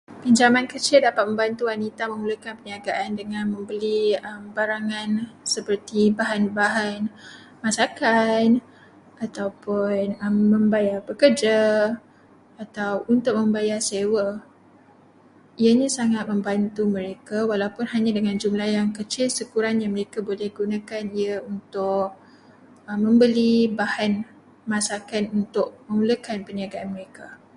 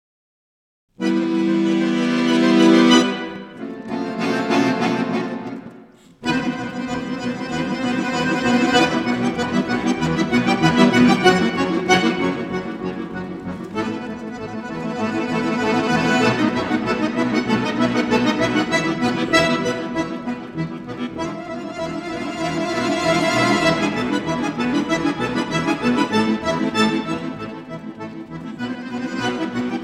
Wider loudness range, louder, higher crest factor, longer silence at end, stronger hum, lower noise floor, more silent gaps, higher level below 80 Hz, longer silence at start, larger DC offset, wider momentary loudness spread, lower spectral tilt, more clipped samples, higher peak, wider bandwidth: about the same, 5 LU vs 7 LU; second, -23 LUFS vs -20 LUFS; about the same, 20 dB vs 20 dB; first, 0.2 s vs 0 s; neither; first, -53 dBFS vs -45 dBFS; neither; second, -66 dBFS vs -50 dBFS; second, 0.1 s vs 1 s; neither; about the same, 12 LU vs 13 LU; about the same, -4.5 dB/octave vs -5 dB/octave; neither; second, -4 dBFS vs 0 dBFS; about the same, 11.5 kHz vs 12.5 kHz